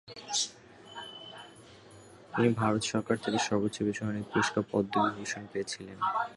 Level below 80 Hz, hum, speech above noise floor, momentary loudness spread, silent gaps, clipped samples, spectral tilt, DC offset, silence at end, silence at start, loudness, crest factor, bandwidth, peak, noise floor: -64 dBFS; none; 23 dB; 16 LU; none; under 0.1%; -4.5 dB/octave; under 0.1%; 0 s; 0.05 s; -31 LUFS; 20 dB; 11.5 kHz; -12 dBFS; -53 dBFS